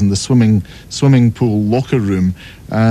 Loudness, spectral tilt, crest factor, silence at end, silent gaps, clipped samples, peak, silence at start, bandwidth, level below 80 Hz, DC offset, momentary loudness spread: -14 LUFS; -7 dB/octave; 12 dB; 0 s; none; under 0.1%; 0 dBFS; 0 s; 12.5 kHz; -40 dBFS; under 0.1%; 9 LU